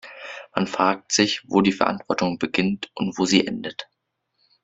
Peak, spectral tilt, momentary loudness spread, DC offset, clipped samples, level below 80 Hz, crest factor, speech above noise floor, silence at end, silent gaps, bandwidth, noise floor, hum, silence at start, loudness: -2 dBFS; -4 dB/octave; 12 LU; under 0.1%; under 0.1%; -60 dBFS; 22 dB; 53 dB; 0.8 s; none; 8.2 kHz; -75 dBFS; none; 0.05 s; -22 LUFS